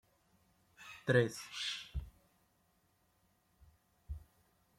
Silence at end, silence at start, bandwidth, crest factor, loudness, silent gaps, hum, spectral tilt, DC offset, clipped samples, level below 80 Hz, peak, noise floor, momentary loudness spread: 0.55 s; 0.8 s; 16 kHz; 26 dB; -37 LUFS; none; none; -5 dB/octave; under 0.1%; under 0.1%; -56 dBFS; -16 dBFS; -75 dBFS; 22 LU